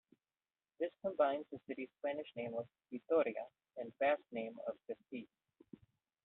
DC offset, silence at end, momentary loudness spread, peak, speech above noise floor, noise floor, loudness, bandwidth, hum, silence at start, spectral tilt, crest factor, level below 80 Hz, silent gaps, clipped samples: under 0.1%; 1 s; 15 LU; -22 dBFS; over 50 dB; under -90 dBFS; -41 LUFS; 4.1 kHz; none; 0.8 s; -3.5 dB/octave; 20 dB; -86 dBFS; none; under 0.1%